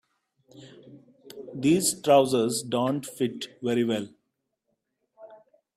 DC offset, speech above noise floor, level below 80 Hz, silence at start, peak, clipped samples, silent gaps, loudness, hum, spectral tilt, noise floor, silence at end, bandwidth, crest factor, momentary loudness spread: under 0.1%; 55 dB; -70 dBFS; 0.55 s; -8 dBFS; under 0.1%; none; -25 LUFS; none; -4.5 dB/octave; -79 dBFS; 0.4 s; 15.5 kHz; 20 dB; 20 LU